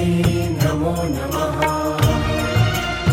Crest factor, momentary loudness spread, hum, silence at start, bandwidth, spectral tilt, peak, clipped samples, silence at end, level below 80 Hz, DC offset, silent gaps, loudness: 16 dB; 4 LU; none; 0 s; 17 kHz; -6 dB/octave; -4 dBFS; under 0.1%; 0 s; -32 dBFS; under 0.1%; none; -19 LUFS